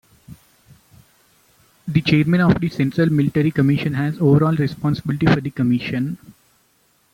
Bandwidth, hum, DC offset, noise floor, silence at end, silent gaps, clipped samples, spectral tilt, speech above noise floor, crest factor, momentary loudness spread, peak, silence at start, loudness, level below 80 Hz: 16.5 kHz; none; under 0.1%; -61 dBFS; 0.95 s; none; under 0.1%; -8 dB/octave; 43 dB; 16 dB; 7 LU; -2 dBFS; 0.3 s; -18 LUFS; -48 dBFS